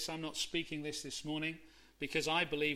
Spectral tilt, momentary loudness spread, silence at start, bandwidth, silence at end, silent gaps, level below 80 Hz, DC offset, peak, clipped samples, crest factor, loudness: -3 dB/octave; 8 LU; 0 s; 16 kHz; 0 s; none; -64 dBFS; under 0.1%; -18 dBFS; under 0.1%; 20 dB; -38 LUFS